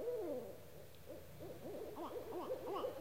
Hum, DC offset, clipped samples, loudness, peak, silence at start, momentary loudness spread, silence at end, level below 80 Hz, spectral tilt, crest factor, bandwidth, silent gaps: none; 0.1%; under 0.1%; -48 LUFS; -32 dBFS; 0 s; 12 LU; 0 s; -70 dBFS; -6 dB/octave; 14 dB; 16 kHz; none